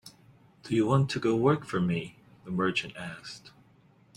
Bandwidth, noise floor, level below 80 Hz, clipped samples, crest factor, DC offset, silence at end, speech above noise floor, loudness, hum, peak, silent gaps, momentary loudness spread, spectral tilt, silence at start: 12 kHz; -61 dBFS; -62 dBFS; under 0.1%; 20 dB; under 0.1%; 0.65 s; 33 dB; -29 LUFS; none; -10 dBFS; none; 18 LU; -6.5 dB/octave; 0.05 s